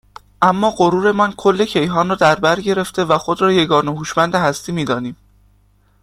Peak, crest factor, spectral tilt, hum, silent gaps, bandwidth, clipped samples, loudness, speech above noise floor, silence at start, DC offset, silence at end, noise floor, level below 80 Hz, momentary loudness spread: 0 dBFS; 16 dB; -5 dB/octave; 50 Hz at -45 dBFS; none; 15 kHz; under 0.1%; -16 LUFS; 39 dB; 0.4 s; under 0.1%; 0.9 s; -55 dBFS; -50 dBFS; 6 LU